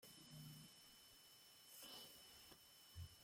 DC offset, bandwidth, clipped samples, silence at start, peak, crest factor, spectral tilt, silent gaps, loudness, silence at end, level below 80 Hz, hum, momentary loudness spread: under 0.1%; 16.5 kHz; under 0.1%; 0 s; -46 dBFS; 18 dB; -3 dB/octave; none; -61 LUFS; 0 s; -78 dBFS; none; 7 LU